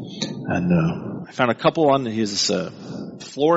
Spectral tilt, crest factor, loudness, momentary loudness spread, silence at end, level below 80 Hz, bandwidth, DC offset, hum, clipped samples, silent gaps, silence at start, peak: -5 dB/octave; 18 dB; -21 LUFS; 15 LU; 0 s; -54 dBFS; 8 kHz; under 0.1%; none; under 0.1%; none; 0 s; -2 dBFS